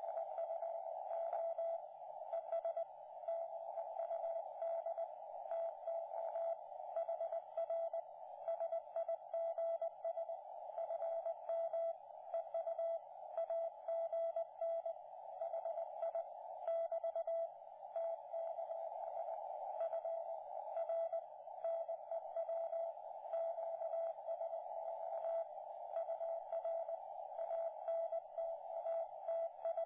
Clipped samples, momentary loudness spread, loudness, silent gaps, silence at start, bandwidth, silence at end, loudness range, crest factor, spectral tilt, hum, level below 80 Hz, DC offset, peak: under 0.1%; 6 LU; -44 LUFS; none; 0 s; 3.6 kHz; 0 s; 1 LU; 12 dB; -1 dB/octave; none; under -90 dBFS; under 0.1%; -32 dBFS